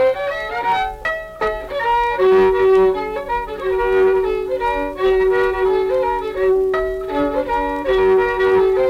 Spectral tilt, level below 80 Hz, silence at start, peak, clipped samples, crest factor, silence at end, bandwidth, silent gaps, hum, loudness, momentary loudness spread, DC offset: -6 dB/octave; -38 dBFS; 0 s; -6 dBFS; under 0.1%; 12 dB; 0 s; 6.8 kHz; none; none; -17 LUFS; 9 LU; under 0.1%